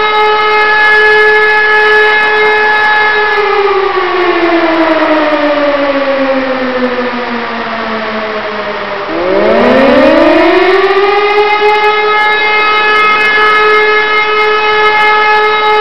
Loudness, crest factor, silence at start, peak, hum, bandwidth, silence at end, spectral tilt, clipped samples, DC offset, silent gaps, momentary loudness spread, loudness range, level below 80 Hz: -8 LUFS; 8 dB; 0 s; 0 dBFS; none; 10 kHz; 0 s; -4.5 dB/octave; 0.9%; 4%; none; 9 LU; 6 LU; -42 dBFS